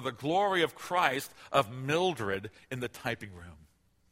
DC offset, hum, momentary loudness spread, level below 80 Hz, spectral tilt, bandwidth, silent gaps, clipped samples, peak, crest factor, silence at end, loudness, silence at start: under 0.1%; none; 11 LU; -64 dBFS; -4.5 dB/octave; 16 kHz; none; under 0.1%; -10 dBFS; 22 dB; 0.6 s; -31 LUFS; 0 s